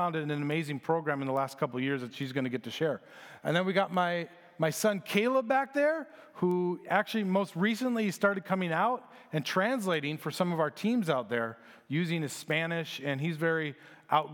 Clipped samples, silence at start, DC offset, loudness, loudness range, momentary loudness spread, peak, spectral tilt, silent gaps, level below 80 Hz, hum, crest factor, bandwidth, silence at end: under 0.1%; 0 s; under 0.1%; -31 LUFS; 3 LU; 7 LU; -10 dBFS; -5.5 dB/octave; none; -86 dBFS; none; 20 dB; 19 kHz; 0 s